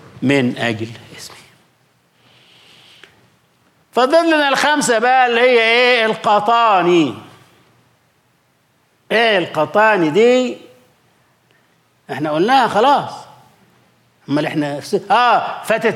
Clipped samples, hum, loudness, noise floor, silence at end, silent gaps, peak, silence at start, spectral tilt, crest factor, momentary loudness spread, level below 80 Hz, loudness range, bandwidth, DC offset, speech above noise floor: under 0.1%; none; -14 LUFS; -59 dBFS; 0 s; none; -2 dBFS; 0.15 s; -4 dB/octave; 14 dB; 16 LU; -68 dBFS; 7 LU; 15.5 kHz; under 0.1%; 45 dB